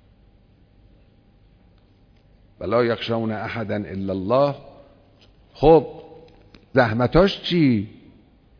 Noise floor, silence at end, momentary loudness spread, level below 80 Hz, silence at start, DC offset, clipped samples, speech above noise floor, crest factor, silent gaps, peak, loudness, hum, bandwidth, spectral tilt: -55 dBFS; 0.7 s; 16 LU; -42 dBFS; 2.6 s; under 0.1%; under 0.1%; 35 dB; 20 dB; none; -2 dBFS; -20 LUFS; none; 5.4 kHz; -8 dB/octave